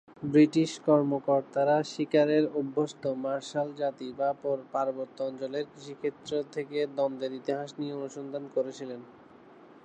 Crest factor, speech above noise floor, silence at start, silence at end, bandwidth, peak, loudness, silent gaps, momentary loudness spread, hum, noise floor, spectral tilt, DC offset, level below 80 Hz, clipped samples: 18 dB; 24 dB; 0.1 s; 0.75 s; 9 kHz; -10 dBFS; -30 LUFS; none; 12 LU; none; -53 dBFS; -6.5 dB/octave; under 0.1%; -76 dBFS; under 0.1%